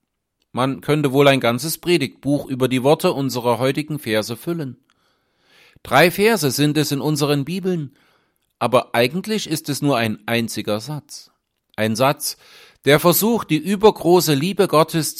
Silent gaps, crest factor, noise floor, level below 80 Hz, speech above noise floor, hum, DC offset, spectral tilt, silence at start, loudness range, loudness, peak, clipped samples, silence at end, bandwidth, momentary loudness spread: none; 18 dB; -72 dBFS; -56 dBFS; 54 dB; none; under 0.1%; -5 dB/octave; 0.55 s; 5 LU; -18 LUFS; 0 dBFS; under 0.1%; 0 s; 16.5 kHz; 11 LU